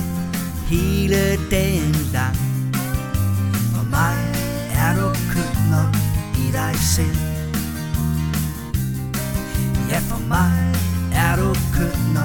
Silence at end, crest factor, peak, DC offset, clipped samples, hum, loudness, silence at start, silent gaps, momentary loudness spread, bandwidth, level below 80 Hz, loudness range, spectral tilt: 0 s; 14 dB; -4 dBFS; under 0.1%; under 0.1%; none; -20 LUFS; 0 s; none; 6 LU; 19 kHz; -28 dBFS; 2 LU; -5.5 dB/octave